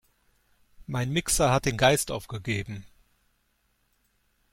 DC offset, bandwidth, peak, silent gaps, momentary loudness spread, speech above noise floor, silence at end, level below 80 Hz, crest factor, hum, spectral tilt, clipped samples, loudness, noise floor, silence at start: under 0.1%; 16.5 kHz; -6 dBFS; none; 13 LU; 45 dB; 1.65 s; -48 dBFS; 22 dB; none; -4 dB/octave; under 0.1%; -26 LUFS; -71 dBFS; 0.8 s